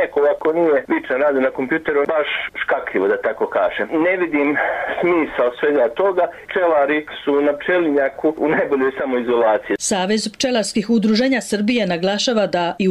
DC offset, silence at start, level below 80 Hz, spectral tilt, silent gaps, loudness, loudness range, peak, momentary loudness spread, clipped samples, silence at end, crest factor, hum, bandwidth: under 0.1%; 0 s; -56 dBFS; -4 dB/octave; none; -18 LUFS; 1 LU; -8 dBFS; 4 LU; under 0.1%; 0 s; 10 dB; none; 14 kHz